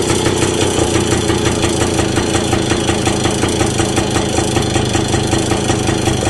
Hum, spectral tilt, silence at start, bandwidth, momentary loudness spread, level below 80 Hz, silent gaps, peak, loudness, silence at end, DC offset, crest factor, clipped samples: none; -4.5 dB/octave; 0 s; 13.5 kHz; 1 LU; -28 dBFS; none; -2 dBFS; -15 LUFS; 0 s; under 0.1%; 12 dB; under 0.1%